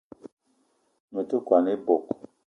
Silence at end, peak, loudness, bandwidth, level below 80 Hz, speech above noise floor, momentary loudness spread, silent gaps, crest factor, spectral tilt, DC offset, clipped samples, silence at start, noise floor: 0.4 s; -6 dBFS; -26 LUFS; 6.6 kHz; -72 dBFS; 45 dB; 14 LU; 0.32-0.37 s, 1.00-1.08 s; 22 dB; -8.5 dB/octave; under 0.1%; under 0.1%; 0.25 s; -69 dBFS